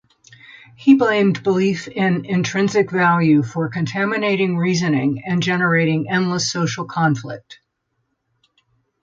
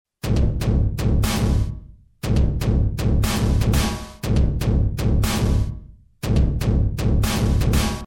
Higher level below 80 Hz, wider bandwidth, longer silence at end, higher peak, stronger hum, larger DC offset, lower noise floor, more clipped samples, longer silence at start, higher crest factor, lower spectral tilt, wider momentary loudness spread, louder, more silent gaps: second, -60 dBFS vs -22 dBFS; second, 7.6 kHz vs 17 kHz; first, 1.5 s vs 0 s; first, -2 dBFS vs -6 dBFS; neither; neither; first, -72 dBFS vs -40 dBFS; neither; first, 0.8 s vs 0.25 s; first, 18 dB vs 12 dB; about the same, -5.5 dB/octave vs -6 dB/octave; first, 8 LU vs 5 LU; first, -18 LUFS vs -21 LUFS; neither